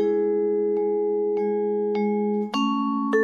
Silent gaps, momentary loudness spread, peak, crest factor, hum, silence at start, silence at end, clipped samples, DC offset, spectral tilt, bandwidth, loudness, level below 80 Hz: none; 2 LU; -12 dBFS; 12 dB; none; 0 s; 0 s; under 0.1%; under 0.1%; -7 dB/octave; 7 kHz; -24 LUFS; -72 dBFS